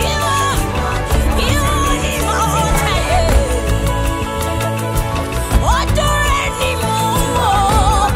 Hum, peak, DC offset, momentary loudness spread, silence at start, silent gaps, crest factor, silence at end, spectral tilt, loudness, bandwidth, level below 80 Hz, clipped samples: none; 0 dBFS; under 0.1%; 5 LU; 0 s; none; 14 dB; 0 s; -4.5 dB/octave; -16 LUFS; 16.5 kHz; -20 dBFS; under 0.1%